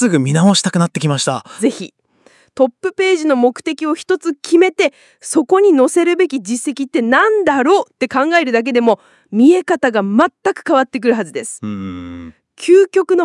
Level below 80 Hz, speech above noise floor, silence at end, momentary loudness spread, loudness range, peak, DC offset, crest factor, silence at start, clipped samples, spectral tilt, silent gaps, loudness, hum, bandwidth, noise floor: -64 dBFS; 37 dB; 0 s; 13 LU; 3 LU; 0 dBFS; under 0.1%; 14 dB; 0 s; under 0.1%; -5 dB/octave; none; -14 LUFS; none; 12 kHz; -51 dBFS